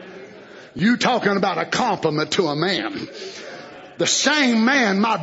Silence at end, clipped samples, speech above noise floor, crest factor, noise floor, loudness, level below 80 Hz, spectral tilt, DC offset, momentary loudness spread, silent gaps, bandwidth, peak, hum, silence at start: 0 s; under 0.1%; 22 dB; 16 dB; -41 dBFS; -19 LUFS; -62 dBFS; -3.5 dB/octave; under 0.1%; 20 LU; none; 8 kHz; -4 dBFS; none; 0 s